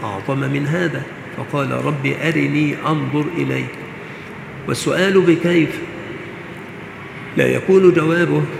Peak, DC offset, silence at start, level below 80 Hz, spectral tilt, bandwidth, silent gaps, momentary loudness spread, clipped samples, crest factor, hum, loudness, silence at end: 0 dBFS; under 0.1%; 0 s; -54 dBFS; -6.5 dB/octave; 14.5 kHz; none; 18 LU; under 0.1%; 18 dB; none; -17 LUFS; 0 s